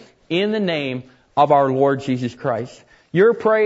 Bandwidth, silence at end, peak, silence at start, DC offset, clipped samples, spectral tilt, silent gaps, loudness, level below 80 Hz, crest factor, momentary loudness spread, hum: 8 kHz; 0 s; -2 dBFS; 0.3 s; under 0.1%; under 0.1%; -7 dB/octave; none; -19 LUFS; -62 dBFS; 16 dB; 12 LU; none